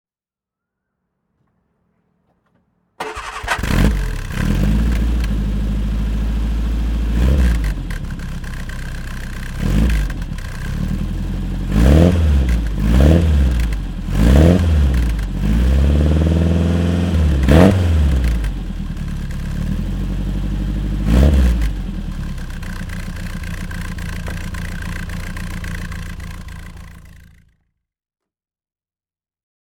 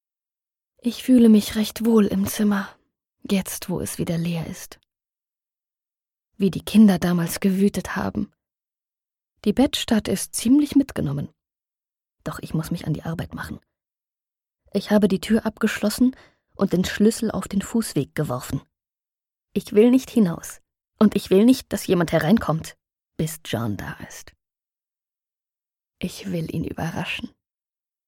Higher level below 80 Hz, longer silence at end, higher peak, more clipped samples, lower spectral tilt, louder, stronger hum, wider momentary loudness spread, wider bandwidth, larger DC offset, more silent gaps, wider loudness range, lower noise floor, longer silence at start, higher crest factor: first, -20 dBFS vs -50 dBFS; first, 2.65 s vs 0.8 s; first, 0 dBFS vs -4 dBFS; neither; about the same, -7 dB/octave vs -6 dB/octave; first, -18 LUFS vs -22 LUFS; neither; about the same, 16 LU vs 17 LU; about the same, 16.5 kHz vs 17 kHz; neither; neither; first, 14 LU vs 11 LU; about the same, under -90 dBFS vs under -90 dBFS; first, 3 s vs 0.85 s; about the same, 18 dB vs 18 dB